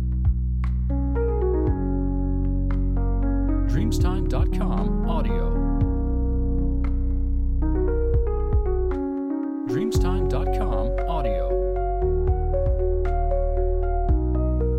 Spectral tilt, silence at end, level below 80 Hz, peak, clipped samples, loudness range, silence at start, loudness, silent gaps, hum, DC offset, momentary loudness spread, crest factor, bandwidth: -8.5 dB/octave; 0 s; -24 dBFS; -10 dBFS; under 0.1%; 1 LU; 0 s; -25 LUFS; none; none; under 0.1%; 3 LU; 12 dB; 8.6 kHz